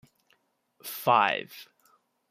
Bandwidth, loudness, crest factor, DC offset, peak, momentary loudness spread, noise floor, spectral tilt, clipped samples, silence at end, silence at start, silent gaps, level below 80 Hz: 15.5 kHz; -25 LUFS; 22 dB; under 0.1%; -8 dBFS; 22 LU; -70 dBFS; -3.5 dB/octave; under 0.1%; 0.65 s; 0.85 s; none; -82 dBFS